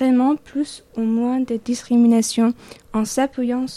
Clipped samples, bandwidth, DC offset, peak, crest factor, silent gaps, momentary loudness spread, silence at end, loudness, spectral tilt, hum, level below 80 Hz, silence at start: under 0.1%; 13.5 kHz; under 0.1%; -6 dBFS; 12 dB; none; 11 LU; 0 s; -20 LUFS; -4.5 dB/octave; none; -54 dBFS; 0 s